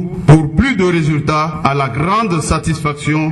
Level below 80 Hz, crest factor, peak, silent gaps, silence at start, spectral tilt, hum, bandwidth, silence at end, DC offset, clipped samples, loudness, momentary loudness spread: -30 dBFS; 14 dB; 0 dBFS; none; 0 s; -6.5 dB/octave; none; 11.5 kHz; 0 s; under 0.1%; under 0.1%; -14 LUFS; 6 LU